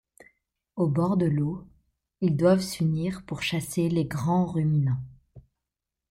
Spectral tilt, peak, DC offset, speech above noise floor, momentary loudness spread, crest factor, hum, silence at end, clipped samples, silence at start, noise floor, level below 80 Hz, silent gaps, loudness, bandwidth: -7 dB/octave; -10 dBFS; under 0.1%; 62 dB; 9 LU; 16 dB; none; 0.7 s; under 0.1%; 0.75 s; -87 dBFS; -56 dBFS; none; -26 LUFS; 16 kHz